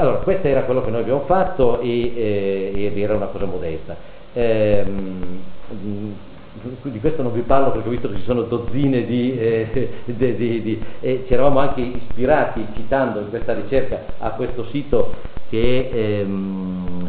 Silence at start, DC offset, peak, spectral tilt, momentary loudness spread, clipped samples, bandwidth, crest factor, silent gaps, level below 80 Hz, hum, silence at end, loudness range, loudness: 0 s; under 0.1%; -2 dBFS; -6.5 dB/octave; 12 LU; under 0.1%; 4.7 kHz; 16 dB; none; -34 dBFS; none; 0 s; 4 LU; -21 LUFS